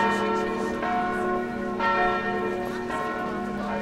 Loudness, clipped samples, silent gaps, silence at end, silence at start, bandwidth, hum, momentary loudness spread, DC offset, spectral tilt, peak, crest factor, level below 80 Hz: -27 LUFS; under 0.1%; none; 0 s; 0 s; 15.5 kHz; none; 6 LU; under 0.1%; -5.5 dB/octave; -12 dBFS; 14 dB; -50 dBFS